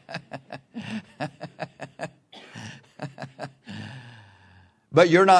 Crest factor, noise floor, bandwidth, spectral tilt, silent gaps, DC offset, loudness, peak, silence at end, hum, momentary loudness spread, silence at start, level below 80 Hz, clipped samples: 22 dB; -56 dBFS; 10.5 kHz; -5.5 dB/octave; none; under 0.1%; -27 LUFS; -2 dBFS; 0 s; none; 21 LU; 0.1 s; -70 dBFS; under 0.1%